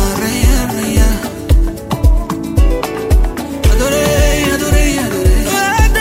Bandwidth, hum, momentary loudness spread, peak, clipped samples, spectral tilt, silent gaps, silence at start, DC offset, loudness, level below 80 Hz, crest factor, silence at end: 16.5 kHz; none; 5 LU; 0 dBFS; under 0.1%; -5 dB/octave; none; 0 s; under 0.1%; -14 LUFS; -14 dBFS; 12 dB; 0 s